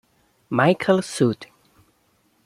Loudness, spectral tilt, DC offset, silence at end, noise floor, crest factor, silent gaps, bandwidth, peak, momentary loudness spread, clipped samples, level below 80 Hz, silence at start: -21 LUFS; -6 dB/octave; under 0.1%; 1 s; -64 dBFS; 20 dB; none; 14.5 kHz; -4 dBFS; 8 LU; under 0.1%; -64 dBFS; 0.5 s